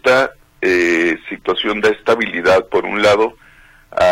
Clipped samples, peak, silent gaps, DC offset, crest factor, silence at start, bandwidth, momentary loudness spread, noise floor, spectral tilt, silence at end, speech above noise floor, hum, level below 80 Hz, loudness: under 0.1%; -4 dBFS; none; under 0.1%; 12 dB; 0.05 s; 15.5 kHz; 7 LU; -42 dBFS; -4 dB/octave; 0 s; 27 dB; none; -48 dBFS; -15 LUFS